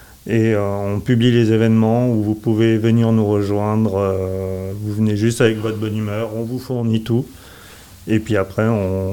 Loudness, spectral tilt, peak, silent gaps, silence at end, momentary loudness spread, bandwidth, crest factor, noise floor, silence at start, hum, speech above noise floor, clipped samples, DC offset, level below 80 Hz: -18 LUFS; -7.5 dB/octave; 0 dBFS; none; 0 s; 9 LU; 18 kHz; 18 dB; -40 dBFS; 0.25 s; none; 24 dB; under 0.1%; 0.3%; -50 dBFS